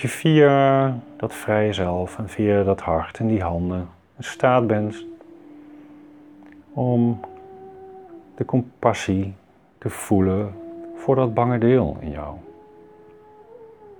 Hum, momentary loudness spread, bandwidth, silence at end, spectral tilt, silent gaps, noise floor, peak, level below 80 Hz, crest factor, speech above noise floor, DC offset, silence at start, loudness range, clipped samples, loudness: none; 20 LU; 19.5 kHz; 0.05 s; -7 dB/octave; none; -48 dBFS; -2 dBFS; -48 dBFS; 20 dB; 27 dB; under 0.1%; 0 s; 6 LU; under 0.1%; -21 LUFS